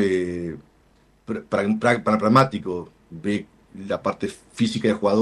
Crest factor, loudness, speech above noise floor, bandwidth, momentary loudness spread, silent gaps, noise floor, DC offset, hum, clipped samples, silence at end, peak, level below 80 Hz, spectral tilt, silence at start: 20 dB; -23 LUFS; 36 dB; 12 kHz; 16 LU; none; -58 dBFS; under 0.1%; none; under 0.1%; 0 s; -4 dBFS; -56 dBFS; -6.5 dB/octave; 0 s